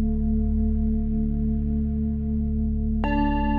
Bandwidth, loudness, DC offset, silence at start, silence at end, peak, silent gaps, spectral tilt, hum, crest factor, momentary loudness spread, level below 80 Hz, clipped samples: 4.7 kHz; -25 LUFS; under 0.1%; 0 s; 0 s; -12 dBFS; none; -8.5 dB/octave; none; 12 dB; 2 LU; -26 dBFS; under 0.1%